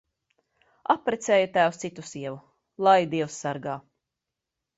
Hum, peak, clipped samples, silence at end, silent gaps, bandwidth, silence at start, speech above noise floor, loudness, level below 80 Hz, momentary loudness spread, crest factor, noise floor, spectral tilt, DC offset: none; -6 dBFS; under 0.1%; 1 s; none; 8 kHz; 0.9 s; 61 dB; -25 LUFS; -70 dBFS; 16 LU; 22 dB; -86 dBFS; -4.5 dB/octave; under 0.1%